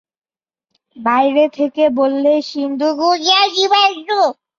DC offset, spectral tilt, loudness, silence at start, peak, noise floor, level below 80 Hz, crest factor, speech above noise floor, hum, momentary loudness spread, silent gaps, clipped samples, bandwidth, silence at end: under 0.1%; -2 dB/octave; -14 LUFS; 0.95 s; -2 dBFS; -81 dBFS; -66 dBFS; 14 dB; 66 dB; none; 6 LU; none; under 0.1%; 7.4 kHz; 0.25 s